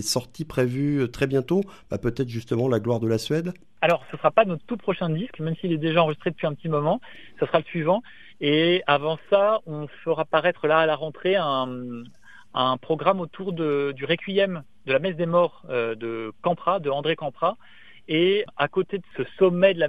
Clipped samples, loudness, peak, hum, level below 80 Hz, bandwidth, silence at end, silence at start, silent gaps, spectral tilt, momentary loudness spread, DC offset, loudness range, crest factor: under 0.1%; -24 LUFS; -2 dBFS; none; -56 dBFS; 13.5 kHz; 0 s; 0 s; none; -5.5 dB/octave; 9 LU; 0.4%; 3 LU; 22 dB